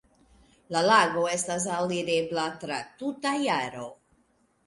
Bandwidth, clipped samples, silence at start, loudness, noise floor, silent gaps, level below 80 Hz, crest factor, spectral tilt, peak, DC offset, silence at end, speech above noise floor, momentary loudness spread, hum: 11.5 kHz; under 0.1%; 0.7 s; -27 LUFS; -68 dBFS; none; -66 dBFS; 20 dB; -3.5 dB/octave; -8 dBFS; under 0.1%; 0.75 s; 41 dB; 14 LU; none